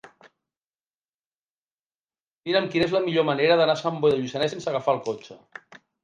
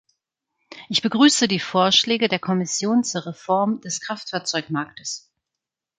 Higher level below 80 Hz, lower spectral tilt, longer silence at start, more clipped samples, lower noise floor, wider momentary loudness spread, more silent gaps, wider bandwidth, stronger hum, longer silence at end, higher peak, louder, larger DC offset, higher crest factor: about the same, -66 dBFS vs -68 dBFS; first, -5.5 dB/octave vs -3.5 dB/octave; second, 0.05 s vs 0.7 s; neither; first, under -90 dBFS vs -85 dBFS; first, 21 LU vs 13 LU; first, 0.57-0.71 s, 0.95-0.99 s, 1.09-1.20 s, 1.27-1.31 s, 1.42-2.06 s, 2.20-2.39 s vs none; about the same, 9.6 kHz vs 9.6 kHz; neither; about the same, 0.7 s vs 0.8 s; second, -8 dBFS vs -4 dBFS; about the same, -23 LUFS vs -21 LUFS; neither; about the same, 18 dB vs 18 dB